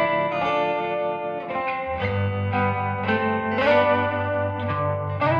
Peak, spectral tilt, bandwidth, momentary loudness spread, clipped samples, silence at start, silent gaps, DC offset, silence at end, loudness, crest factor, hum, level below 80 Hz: -8 dBFS; -8 dB/octave; 6.6 kHz; 7 LU; under 0.1%; 0 s; none; under 0.1%; 0 s; -23 LUFS; 16 dB; none; -54 dBFS